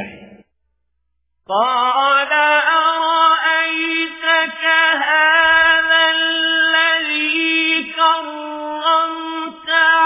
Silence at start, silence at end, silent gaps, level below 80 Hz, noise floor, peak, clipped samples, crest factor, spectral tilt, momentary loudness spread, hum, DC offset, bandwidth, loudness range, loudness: 0 s; 0 s; none; -58 dBFS; -72 dBFS; -2 dBFS; under 0.1%; 14 dB; -4.5 dB/octave; 10 LU; none; under 0.1%; 3.9 kHz; 3 LU; -14 LUFS